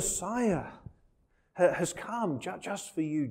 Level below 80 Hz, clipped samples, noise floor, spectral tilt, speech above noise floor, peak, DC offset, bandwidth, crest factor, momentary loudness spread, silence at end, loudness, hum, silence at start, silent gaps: -56 dBFS; under 0.1%; -69 dBFS; -4.5 dB/octave; 38 dB; -12 dBFS; under 0.1%; 16 kHz; 20 dB; 14 LU; 0 s; -32 LUFS; none; 0 s; none